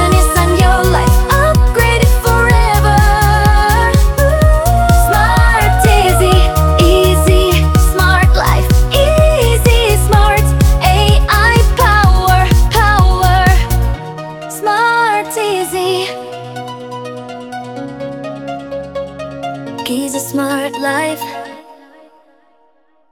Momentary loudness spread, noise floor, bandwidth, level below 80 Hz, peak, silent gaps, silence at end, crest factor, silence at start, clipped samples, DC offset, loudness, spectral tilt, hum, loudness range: 15 LU; -55 dBFS; 20 kHz; -14 dBFS; 0 dBFS; none; 1.5 s; 10 dB; 0 s; under 0.1%; under 0.1%; -11 LUFS; -5 dB/octave; none; 11 LU